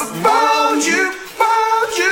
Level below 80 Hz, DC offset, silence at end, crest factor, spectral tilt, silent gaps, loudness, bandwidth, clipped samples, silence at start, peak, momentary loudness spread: -56 dBFS; under 0.1%; 0 s; 14 dB; -2 dB/octave; none; -15 LUFS; 17 kHz; under 0.1%; 0 s; -2 dBFS; 4 LU